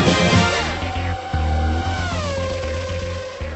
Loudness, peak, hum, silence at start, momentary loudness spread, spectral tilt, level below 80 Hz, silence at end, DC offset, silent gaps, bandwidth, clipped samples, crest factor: -21 LUFS; -4 dBFS; none; 0 s; 11 LU; -5 dB/octave; -32 dBFS; 0 s; under 0.1%; none; 8.4 kHz; under 0.1%; 16 dB